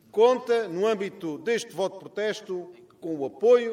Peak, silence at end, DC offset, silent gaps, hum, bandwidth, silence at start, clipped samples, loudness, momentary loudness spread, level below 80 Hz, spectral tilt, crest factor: -8 dBFS; 0 s; under 0.1%; none; none; 12 kHz; 0.15 s; under 0.1%; -26 LUFS; 15 LU; -78 dBFS; -4.5 dB/octave; 18 dB